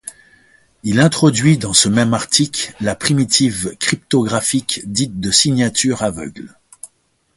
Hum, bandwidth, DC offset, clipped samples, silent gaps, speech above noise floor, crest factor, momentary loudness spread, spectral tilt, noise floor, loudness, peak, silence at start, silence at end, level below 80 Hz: none; 12 kHz; under 0.1%; under 0.1%; none; 45 dB; 16 dB; 9 LU; -3.5 dB/octave; -60 dBFS; -15 LUFS; 0 dBFS; 0.05 s; 0.5 s; -46 dBFS